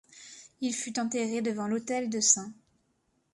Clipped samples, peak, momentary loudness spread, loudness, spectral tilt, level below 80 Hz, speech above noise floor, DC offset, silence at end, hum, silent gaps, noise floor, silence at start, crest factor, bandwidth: under 0.1%; -8 dBFS; 23 LU; -29 LUFS; -2.5 dB/octave; -76 dBFS; 44 dB; under 0.1%; 0.8 s; none; none; -74 dBFS; 0.15 s; 24 dB; 11.5 kHz